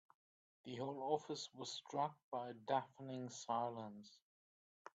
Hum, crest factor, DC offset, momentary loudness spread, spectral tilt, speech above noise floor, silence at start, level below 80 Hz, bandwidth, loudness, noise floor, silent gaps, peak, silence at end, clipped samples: none; 22 dB; under 0.1%; 13 LU; -4.5 dB/octave; over 45 dB; 0.65 s; under -90 dBFS; 9 kHz; -45 LUFS; under -90 dBFS; 2.24-2.32 s, 4.22-4.85 s; -24 dBFS; 0.05 s; under 0.1%